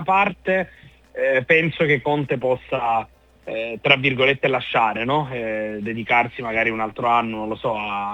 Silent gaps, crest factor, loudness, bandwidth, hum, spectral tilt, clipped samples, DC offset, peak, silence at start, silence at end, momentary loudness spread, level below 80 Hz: none; 22 dB; -20 LUFS; 9 kHz; none; -6.5 dB/octave; under 0.1%; under 0.1%; 0 dBFS; 0 s; 0 s; 11 LU; -54 dBFS